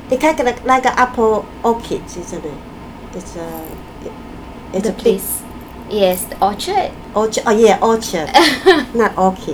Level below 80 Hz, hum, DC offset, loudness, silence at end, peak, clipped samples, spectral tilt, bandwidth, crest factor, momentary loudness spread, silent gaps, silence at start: -40 dBFS; none; under 0.1%; -15 LUFS; 0 s; 0 dBFS; under 0.1%; -4 dB/octave; over 20 kHz; 16 dB; 20 LU; none; 0 s